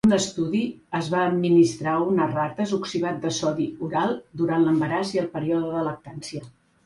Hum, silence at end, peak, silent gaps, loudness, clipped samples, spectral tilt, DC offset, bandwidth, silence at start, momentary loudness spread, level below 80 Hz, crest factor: none; 0.35 s; -8 dBFS; none; -24 LUFS; under 0.1%; -5.5 dB/octave; under 0.1%; 11.5 kHz; 0.05 s; 10 LU; -60 dBFS; 16 dB